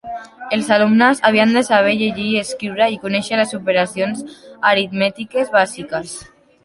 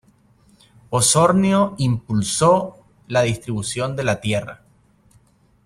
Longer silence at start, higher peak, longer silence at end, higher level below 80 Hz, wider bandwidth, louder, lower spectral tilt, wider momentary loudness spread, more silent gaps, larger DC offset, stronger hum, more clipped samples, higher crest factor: second, 0.05 s vs 0.9 s; about the same, -2 dBFS vs -4 dBFS; second, 0.4 s vs 1.1 s; second, -58 dBFS vs -52 dBFS; second, 11.5 kHz vs 15.5 kHz; first, -16 LUFS vs -19 LUFS; about the same, -4.5 dB/octave vs -4.5 dB/octave; first, 13 LU vs 10 LU; neither; neither; neither; neither; about the same, 16 dB vs 18 dB